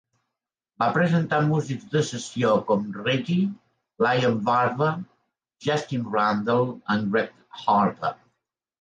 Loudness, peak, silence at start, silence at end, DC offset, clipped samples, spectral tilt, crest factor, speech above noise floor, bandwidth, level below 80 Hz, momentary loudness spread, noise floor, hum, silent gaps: -24 LUFS; -8 dBFS; 0.8 s; 0.65 s; under 0.1%; under 0.1%; -6 dB/octave; 16 dB; 63 dB; 9.8 kHz; -66 dBFS; 8 LU; -86 dBFS; none; none